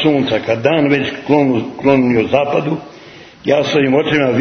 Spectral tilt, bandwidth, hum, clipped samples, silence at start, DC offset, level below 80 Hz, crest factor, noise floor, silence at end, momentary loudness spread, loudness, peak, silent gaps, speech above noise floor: -6.5 dB/octave; 6.6 kHz; none; under 0.1%; 0 s; under 0.1%; -50 dBFS; 14 dB; -38 dBFS; 0 s; 4 LU; -14 LUFS; 0 dBFS; none; 24 dB